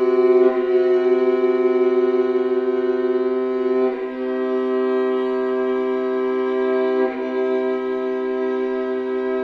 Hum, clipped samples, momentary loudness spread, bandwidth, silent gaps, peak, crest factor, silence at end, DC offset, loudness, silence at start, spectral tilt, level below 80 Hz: none; under 0.1%; 6 LU; 4.9 kHz; none; -4 dBFS; 14 dB; 0 s; under 0.1%; -20 LUFS; 0 s; -6.5 dB/octave; -62 dBFS